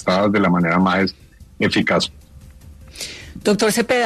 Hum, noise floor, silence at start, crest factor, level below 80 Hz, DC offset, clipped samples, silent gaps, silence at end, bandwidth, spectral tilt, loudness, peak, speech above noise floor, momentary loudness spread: none; -41 dBFS; 0 s; 16 dB; -48 dBFS; under 0.1%; under 0.1%; none; 0 s; 13.5 kHz; -5 dB/octave; -18 LUFS; -4 dBFS; 24 dB; 14 LU